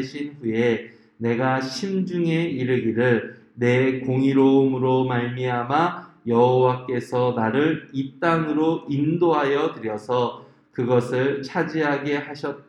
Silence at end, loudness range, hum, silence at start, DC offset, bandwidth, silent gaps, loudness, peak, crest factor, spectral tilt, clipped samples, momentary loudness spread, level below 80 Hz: 0.1 s; 3 LU; none; 0 s; under 0.1%; 11 kHz; none; -22 LUFS; -6 dBFS; 16 dB; -7.5 dB/octave; under 0.1%; 9 LU; -66 dBFS